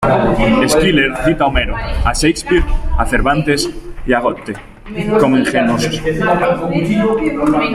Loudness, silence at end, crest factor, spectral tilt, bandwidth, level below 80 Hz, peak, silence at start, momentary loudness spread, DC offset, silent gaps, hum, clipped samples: -14 LUFS; 0 s; 14 dB; -5 dB/octave; 15 kHz; -22 dBFS; 0 dBFS; 0 s; 8 LU; under 0.1%; none; none; under 0.1%